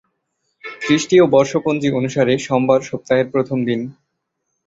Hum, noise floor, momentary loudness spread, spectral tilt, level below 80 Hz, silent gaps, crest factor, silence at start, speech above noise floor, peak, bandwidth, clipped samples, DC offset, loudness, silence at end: none; -74 dBFS; 13 LU; -5.5 dB/octave; -56 dBFS; none; 16 dB; 0.65 s; 58 dB; 0 dBFS; 8 kHz; under 0.1%; under 0.1%; -17 LUFS; 0.75 s